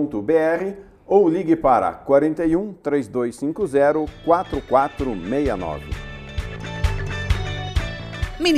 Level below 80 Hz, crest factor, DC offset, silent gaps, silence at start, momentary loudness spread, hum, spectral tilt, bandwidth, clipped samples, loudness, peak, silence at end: -34 dBFS; 18 dB; under 0.1%; none; 0 s; 13 LU; none; -6.5 dB/octave; 14 kHz; under 0.1%; -21 LUFS; -2 dBFS; 0 s